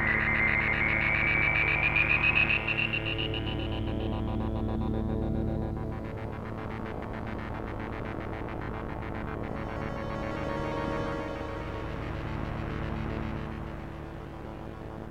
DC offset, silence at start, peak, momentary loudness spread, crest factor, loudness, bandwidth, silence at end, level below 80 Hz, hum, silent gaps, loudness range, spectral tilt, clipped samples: 0.2%; 0 s; -12 dBFS; 14 LU; 18 dB; -30 LUFS; 9.2 kHz; 0 s; -40 dBFS; none; none; 12 LU; -7 dB/octave; under 0.1%